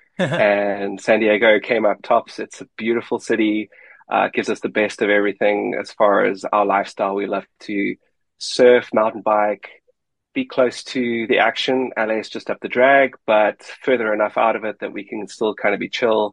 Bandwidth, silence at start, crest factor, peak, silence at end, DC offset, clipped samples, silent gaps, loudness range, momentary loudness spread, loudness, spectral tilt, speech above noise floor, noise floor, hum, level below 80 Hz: 10.5 kHz; 0.2 s; 18 dB; -2 dBFS; 0 s; under 0.1%; under 0.1%; none; 3 LU; 12 LU; -19 LUFS; -4.5 dB/octave; 48 dB; -66 dBFS; none; -68 dBFS